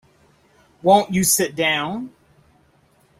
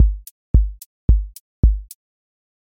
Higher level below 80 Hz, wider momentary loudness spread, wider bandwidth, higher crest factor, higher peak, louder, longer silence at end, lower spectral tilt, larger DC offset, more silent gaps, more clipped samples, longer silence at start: second, -56 dBFS vs -20 dBFS; about the same, 14 LU vs 15 LU; about the same, 16.5 kHz vs 16.5 kHz; about the same, 20 dB vs 16 dB; about the same, -2 dBFS vs -2 dBFS; first, -18 LUFS vs -21 LUFS; first, 1.1 s vs 0.85 s; second, -3 dB/octave vs -8.5 dB/octave; neither; second, none vs 0.31-0.54 s, 0.86-1.08 s, 1.40-1.63 s; neither; first, 0.85 s vs 0 s